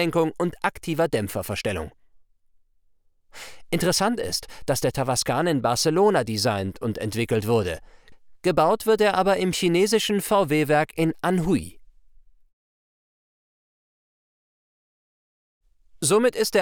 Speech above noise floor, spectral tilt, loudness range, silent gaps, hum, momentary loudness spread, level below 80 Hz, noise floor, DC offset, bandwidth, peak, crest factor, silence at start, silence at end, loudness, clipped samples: 39 dB; -4.5 dB/octave; 8 LU; 12.53-15.61 s; none; 9 LU; -52 dBFS; -61 dBFS; under 0.1%; over 20 kHz; -6 dBFS; 18 dB; 0 s; 0 s; -23 LUFS; under 0.1%